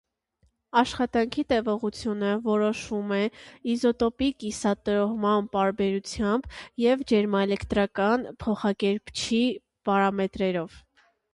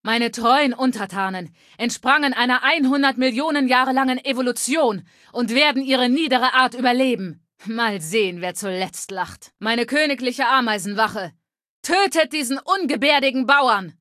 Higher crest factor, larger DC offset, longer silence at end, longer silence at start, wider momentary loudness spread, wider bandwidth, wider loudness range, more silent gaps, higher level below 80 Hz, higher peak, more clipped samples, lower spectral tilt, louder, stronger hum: about the same, 18 dB vs 18 dB; neither; first, 0.55 s vs 0.1 s; first, 0.75 s vs 0.05 s; second, 6 LU vs 11 LU; second, 11.5 kHz vs 14.5 kHz; about the same, 2 LU vs 3 LU; second, none vs 11.69-11.83 s; first, -52 dBFS vs -66 dBFS; second, -8 dBFS vs -2 dBFS; neither; first, -5.5 dB/octave vs -3 dB/octave; second, -26 LUFS vs -19 LUFS; neither